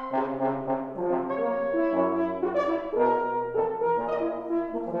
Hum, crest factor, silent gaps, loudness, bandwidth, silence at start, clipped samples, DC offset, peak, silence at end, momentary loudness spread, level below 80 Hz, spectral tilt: none; 16 dB; none; -27 LUFS; 6.6 kHz; 0 s; under 0.1%; under 0.1%; -12 dBFS; 0 s; 5 LU; -58 dBFS; -8.5 dB/octave